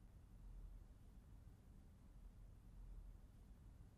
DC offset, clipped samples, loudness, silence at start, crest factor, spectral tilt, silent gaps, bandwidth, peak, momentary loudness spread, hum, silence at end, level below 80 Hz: under 0.1%; under 0.1%; -65 LUFS; 0 s; 12 dB; -7 dB/octave; none; 14.5 kHz; -48 dBFS; 5 LU; none; 0 s; -62 dBFS